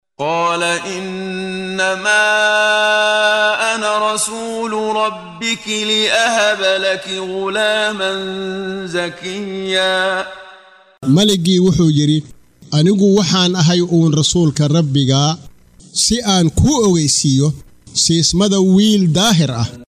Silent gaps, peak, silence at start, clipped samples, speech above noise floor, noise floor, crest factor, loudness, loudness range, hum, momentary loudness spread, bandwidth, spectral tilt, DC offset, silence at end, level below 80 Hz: none; 0 dBFS; 0.2 s; under 0.1%; 28 dB; -43 dBFS; 14 dB; -14 LUFS; 5 LU; none; 10 LU; 15 kHz; -4 dB/octave; under 0.1%; 0.15 s; -40 dBFS